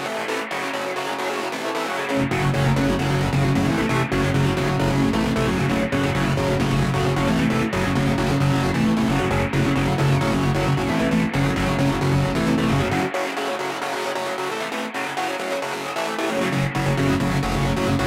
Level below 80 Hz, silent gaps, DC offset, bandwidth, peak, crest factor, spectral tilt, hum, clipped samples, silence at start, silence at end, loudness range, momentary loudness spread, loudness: -36 dBFS; none; under 0.1%; 15.5 kHz; -8 dBFS; 14 dB; -6 dB/octave; none; under 0.1%; 0 s; 0 s; 3 LU; 5 LU; -21 LUFS